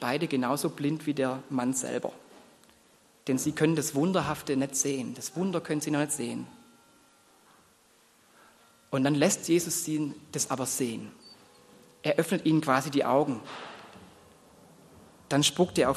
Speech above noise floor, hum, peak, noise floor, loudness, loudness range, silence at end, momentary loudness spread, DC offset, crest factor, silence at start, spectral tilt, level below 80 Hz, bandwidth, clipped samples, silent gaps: 34 dB; none; -8 dBFS; -62 dBFS; -28 LUFS; 5 LU; 0 s; 12 LU; under 0.1%; 22 dB; 0 s; -4 dB/octave; -66 dBFS; 13 kHz; under 0.1%; none